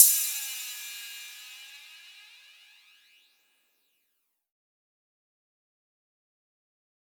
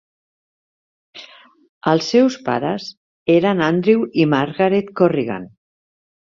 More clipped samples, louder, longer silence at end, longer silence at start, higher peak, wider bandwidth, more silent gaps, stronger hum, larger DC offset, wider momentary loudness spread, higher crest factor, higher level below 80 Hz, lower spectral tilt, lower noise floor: neither; second, -27 LUFS vs -17 LUFS; first, 5.15 s vs 0.9 s; second, 0 s vs 1.15 s; about the same, 0 dBFS vs -2 dBFS; first, over 20 kHz vs 7.4 kHz; second, none vs 1.69-1.81 s, 2.97-3.26 s; neither; neither; first, 23 LU vs 12 LU; first, 32 dB vs 18 dB; second, under -90 dBFS vs -60 dBFS; second, 8 dB/octave vs -6.5 dB/octave; first, -78 dBFS vs -43 dBFS